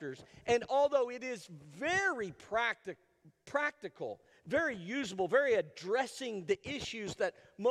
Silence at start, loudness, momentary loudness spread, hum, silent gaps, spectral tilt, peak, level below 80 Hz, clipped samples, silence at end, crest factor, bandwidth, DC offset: 0 s; -35 LUFS; 14 LU; none; none; -4 dB/octave; -16 dBFS; -68 dBFS; under 0.1%; 0 s; 18 dB; 13 kHz; under 0.1%